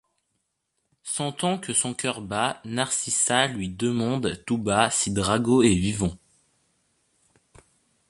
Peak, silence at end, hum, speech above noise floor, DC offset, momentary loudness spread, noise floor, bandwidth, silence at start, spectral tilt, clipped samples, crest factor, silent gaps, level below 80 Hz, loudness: -2 dBFS; 1.95 s; none; 53 dB; under 0.1%; 9 LU; -77 dBFS; 11.5 kHz; 1.05 s; -3.5 dB/octave; under 0.1%; 24 dB; none; -50 dBFS; -24 LUFS